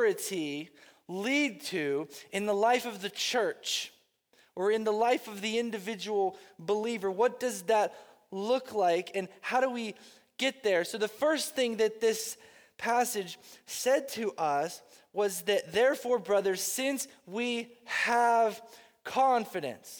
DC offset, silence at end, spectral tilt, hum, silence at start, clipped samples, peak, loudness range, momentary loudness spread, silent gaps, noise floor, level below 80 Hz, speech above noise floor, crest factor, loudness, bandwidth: under 0.1%; 0 s; -3 dB/octave; none; 0 s; under 0.1%; -14 dBFS; 2 LU; 11 LU; none; -67 dBFS; -80 dBFS; 37 dB; 16 dB; -30 LUFS; over 20 kHz